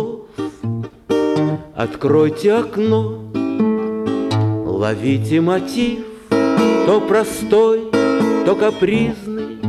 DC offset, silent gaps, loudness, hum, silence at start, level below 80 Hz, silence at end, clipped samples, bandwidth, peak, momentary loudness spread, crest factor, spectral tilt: under 0.1%; none; -17 LUFS; none; 0 s; -48 dBFS; 0 s; under 0.1%; 14 kHz; -2 dBFS; 11 LU; 14 dB; -7 dB/octave